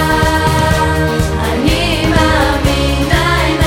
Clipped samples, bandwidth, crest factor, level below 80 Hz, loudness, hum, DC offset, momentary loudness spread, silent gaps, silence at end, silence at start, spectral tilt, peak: under 0.1%; 17 kHz; 12 dB; -20 dBFS; -12 LUFS; none; under 0.1%; 3 LU; none; 0 s; 0 s; -5 dB/octave; 0 dBFS